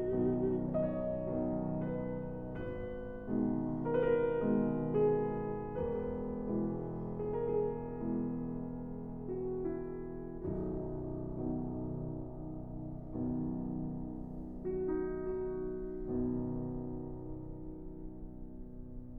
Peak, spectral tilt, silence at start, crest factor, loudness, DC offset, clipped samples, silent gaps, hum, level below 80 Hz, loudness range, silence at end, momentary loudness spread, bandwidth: -20 dBFS; -12 dB/octave; 0 s; 16 dB; -37 LUFS; under 0.1%; under 0.1%; none; none; -50 dBFS; 7 LU; 0 s; 12 LU; 3.5 kHz